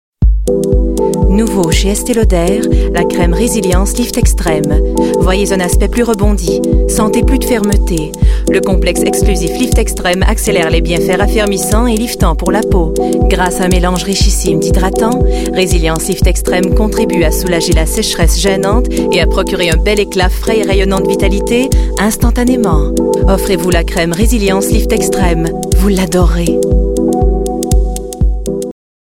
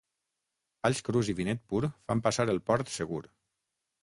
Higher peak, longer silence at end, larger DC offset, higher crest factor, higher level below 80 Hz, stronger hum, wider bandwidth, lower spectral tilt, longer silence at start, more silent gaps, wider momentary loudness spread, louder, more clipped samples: first, 0 dBFS vs -10 dBFS; second, 0.3 s vs 0.8 s; neither; second, 10 dB vs 22 dB; first, -14 dBFS vs -60 dBFS; neither; first, 16.5 kHz vs 11.5 kHz; about the same, -5 dB/octave vs -5.5 dB/octave; second, 0.2 s vs 0.85 s; neither; second, 2 LU vs 7 LU; first, -12 LUFS vs -31 LUFS; neither